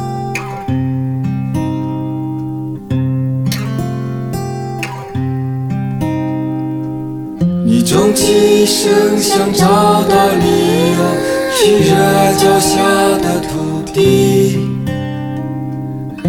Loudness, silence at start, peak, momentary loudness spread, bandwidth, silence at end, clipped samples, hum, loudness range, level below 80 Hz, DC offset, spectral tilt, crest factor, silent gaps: -14 LUFS; 0 s; 0 dBFS; 11 LU; 19 kHz; 0 s; under 0.1%; none; 8 LU; -42 dBFS; under 0.1%; -5 dB/octave; 12 dB; none